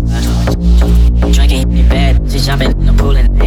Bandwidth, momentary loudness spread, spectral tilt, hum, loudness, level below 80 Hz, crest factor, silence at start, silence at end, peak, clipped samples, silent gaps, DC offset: 13.5 kHz; 3 LU; -6 dB/octave; none; -11 LUFS; -10 dBFS; 8 dB; 0 s; 0 s; -2 dBFS; under 0.1%; none; under 0.1%